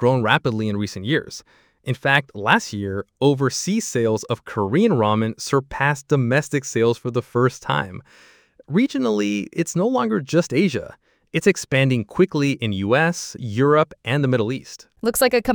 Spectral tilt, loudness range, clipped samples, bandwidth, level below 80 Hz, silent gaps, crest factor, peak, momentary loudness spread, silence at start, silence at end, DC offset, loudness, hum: -5.5 dB/octave; 2 LU; under 0.1%; 20 kHz; -54 dBFS; none; 20 dB; -2 dBFS; 9 LU; 0 s; 0 s; under 0.1%; -21 LUFS; none